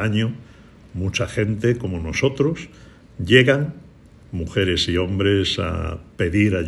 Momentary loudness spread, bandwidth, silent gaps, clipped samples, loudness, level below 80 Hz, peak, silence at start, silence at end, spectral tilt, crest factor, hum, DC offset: 16 LU; 12 kHz; none; under 0.1%; -20 LUFS; -40 dBFS; -2 dBFS; 0 s; 0 s; -5.5 dB/octave; 20 dB; none; under 0.1%